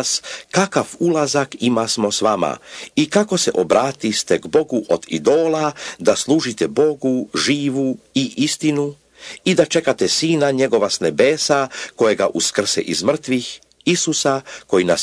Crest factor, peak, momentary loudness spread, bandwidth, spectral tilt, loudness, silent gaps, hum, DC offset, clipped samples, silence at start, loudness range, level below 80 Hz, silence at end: 18 dB; 0 dBFS; 6 LU; 11 kHz; -3.5 dB/octave; -18 LUFS; none; none; under 0.1%; under 0.1%; 0 s; 2 LU; -60 dBFS; 0 s